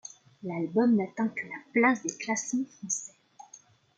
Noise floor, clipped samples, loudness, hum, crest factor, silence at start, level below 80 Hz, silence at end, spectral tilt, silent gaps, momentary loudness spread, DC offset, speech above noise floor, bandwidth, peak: -57 dBFS; under 0.1%; -29 LUFS; none; 18 dB; 0.45 s; -78 dBFS; 0.4 s; -4.5 dB/octave; none; 13 LU; under 0.1%; 28 dB; 9.4 kHz; -12 dBFS